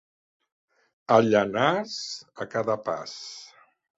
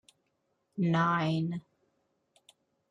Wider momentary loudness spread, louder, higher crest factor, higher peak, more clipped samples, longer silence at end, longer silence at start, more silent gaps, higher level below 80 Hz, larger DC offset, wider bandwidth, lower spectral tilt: first, 19 LU vs 15 LU; first, -25 LUFS vs -30 LUFS; first, 24 dB vs 16 dB; first, -4 dBFS vs -18 dBFS; neither; second, 0.5 s vs 1.3 s; first, 1.1 s vs 0.75 s; neither; first, -68 dBFS vs -74 dBFS; neither; second, 8 kHz vs 9.6 kHz; second, -5 dB/octave vs -7.5 dB/octave